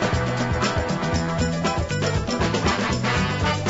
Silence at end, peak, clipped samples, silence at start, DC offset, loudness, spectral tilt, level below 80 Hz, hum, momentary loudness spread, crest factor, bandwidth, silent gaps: 0 s; -8 dBFS; under 0.1%; 0 s; under 0.1%; -23 LUFS; -5 dB/octave; -34 dBFS; none; 2 LU; 14 dB; 8 kHz; none